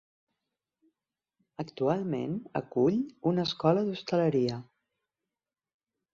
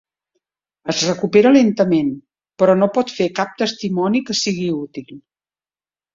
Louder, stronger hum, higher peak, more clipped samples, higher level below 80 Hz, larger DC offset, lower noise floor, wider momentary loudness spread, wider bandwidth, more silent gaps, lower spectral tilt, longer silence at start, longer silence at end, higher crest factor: second, -29 LUFS vs -17 LUFS; neither; second, -12 dBFS vs 0 dBFS; neither; second, -70 dBFS vs -60 dBFS; neither; about the same, under -90 dBFS vs under -90 dBFS; about the same, 13 LU vs 13 LU; about the same, 7.4 kHz vs 7.6 kHz; neither; first, -7.5 dB/octave vs -5 dB/octave; first, 1.6 s vs 0.85 s; first, 1.5 s vs 0.95 s; about the same, 20 dB vs 18 dB